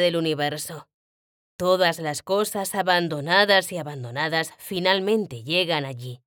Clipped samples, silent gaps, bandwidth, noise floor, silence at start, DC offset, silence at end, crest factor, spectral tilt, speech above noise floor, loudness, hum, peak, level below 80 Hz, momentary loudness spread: under 0.1%; 0.94-1.59 s; over 20 kHz; under -90 dBFS; 0 s; under 0.1%; 0.1 s; 20 dB; -4 dB/octave; over 67 dB; -23 LUFS; none; -4 dBFS; -68 dBFS; 12 LU